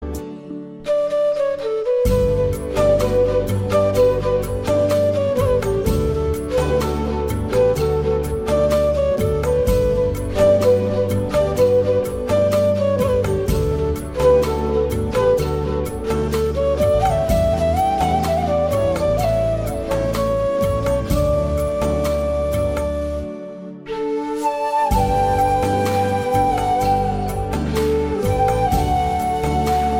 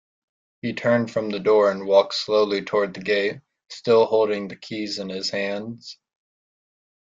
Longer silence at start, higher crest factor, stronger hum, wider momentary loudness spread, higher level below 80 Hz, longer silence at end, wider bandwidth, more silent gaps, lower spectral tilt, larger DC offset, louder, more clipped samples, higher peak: second, 0 s vs 0.65 s; second, 14 dB vs 20 dB; neither; second, 6 LU vs 14 LU; first, -28 dBFS vs -68 dBFS; second, 0 s vs 1.1 s; first, 17 kHz vs 7.8 kHz; neither; first, -6.5 dB/octave vs -5 dB/octave; neither; first, -19 LUFS vs -22 LUFS; neither; about the same, -4 dBFS vs -4 dBFS